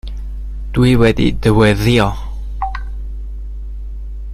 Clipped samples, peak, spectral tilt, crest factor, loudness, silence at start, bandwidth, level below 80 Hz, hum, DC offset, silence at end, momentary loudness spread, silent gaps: under 0.1%; 0 dBFS; -7 dB/octave; 16 dB; -14 LUFS; 0.05 s; 15 kHz; -24 dBFS; none; under 0.1%; 0 s; 18 LU; none